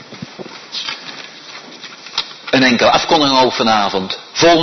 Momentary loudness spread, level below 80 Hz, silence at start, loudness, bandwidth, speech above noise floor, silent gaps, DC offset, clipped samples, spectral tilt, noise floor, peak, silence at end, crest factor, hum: 21 LU; -50 dBFS; 0 s; -14 LUFS; 6.4 kHz; 21 dB; none; under 0.1%; under 0.1%; -3.5 dB/octave; -34 dBFS; -2 dBFS; 0 s; 14 dB; none